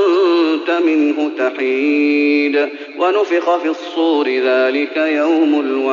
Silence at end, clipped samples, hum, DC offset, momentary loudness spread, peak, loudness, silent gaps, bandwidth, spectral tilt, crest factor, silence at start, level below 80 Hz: 0 s; under 0.1%; none; under 0.1%; 5 LU; -2 dBFS; -15 LUFS; none; 7.2 kHz; 0 dB/octave; 12 dB; 0 s; -76 dBFS